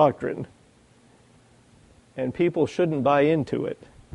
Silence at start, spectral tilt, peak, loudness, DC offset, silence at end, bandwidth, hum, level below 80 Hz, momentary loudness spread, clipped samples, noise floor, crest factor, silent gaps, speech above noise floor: 0 s; -7.5 dB/octave; -6 dBFS; -24 LUFS; under 0.1%; 0.4 s; 11 kHz; none; -60 dBFS; 18 LU; under 0.1%; -57 dBFS; 20 dB; none; 34 dB